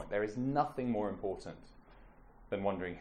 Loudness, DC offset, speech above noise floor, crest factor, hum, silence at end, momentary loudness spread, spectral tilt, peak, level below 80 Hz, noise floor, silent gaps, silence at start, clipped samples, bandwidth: -37 LUFS; under 0.1%; 22 dB; 20 dB; none; 0 s; 12 LU; -7.5 dB/octave; -18 dBFS; -58 dBFS; -58 dBFS; none; 0 s; under 0.1%; 11.5 kHz